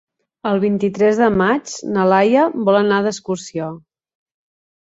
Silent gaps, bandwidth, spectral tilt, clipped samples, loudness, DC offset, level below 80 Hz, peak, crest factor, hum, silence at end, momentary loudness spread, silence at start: none; 8 kHz; -6 dB/octave; under 0.1%; -17 LUFS; under 0.1%; -54 dBFS; -2 dBFS; 16 dB; none; 1.15 s; 12 LU; 0.45 s